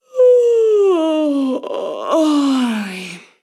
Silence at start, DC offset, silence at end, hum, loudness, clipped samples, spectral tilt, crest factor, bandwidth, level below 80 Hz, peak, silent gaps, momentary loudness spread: 0.15 s; under 0.1%; 0.25 s; none; -15 LUFS; under 0.1%; -5 dB/octave; 12 dB; 13 kHz; -80 dBFS; -4 dBFS; none; 12 LU